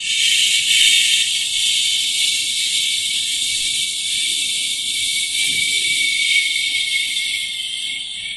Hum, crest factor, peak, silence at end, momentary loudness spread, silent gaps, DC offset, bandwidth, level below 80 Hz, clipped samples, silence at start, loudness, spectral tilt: none; 18 dB; 0 dBFS; 0 s; 7 LU; none; under 0.1%; 15.5 kHz; -56 dBFS; under 0.1%; 0 s; -15 LUFS; 3.5 dB/octave